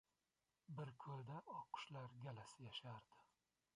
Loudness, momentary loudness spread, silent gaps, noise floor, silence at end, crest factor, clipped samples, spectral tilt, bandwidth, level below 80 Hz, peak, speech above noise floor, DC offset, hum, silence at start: -55 LUFS; 5 LU; none; under -90 dBFS; 0.55 s; 20 dB; under 0.1%; -5.5 dB/octave; 11 kHz; -88 dBFS; -36 dBFS; over 35 dB; under 0.1%; none; 0.7 s